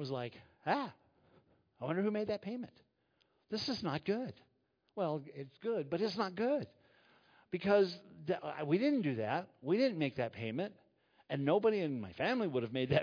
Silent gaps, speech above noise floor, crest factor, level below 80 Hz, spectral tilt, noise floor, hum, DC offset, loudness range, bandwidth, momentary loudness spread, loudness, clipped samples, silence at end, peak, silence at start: none; 42 dB; 20 dB; -74 dBFS; -5 dB/octave; -78 dBFS; none; under 0.1%; 6 LU; 5.4 kHz; 13 LU; -37 LUFS; under 0.1%; 0 s; -16 dBFS; 0 s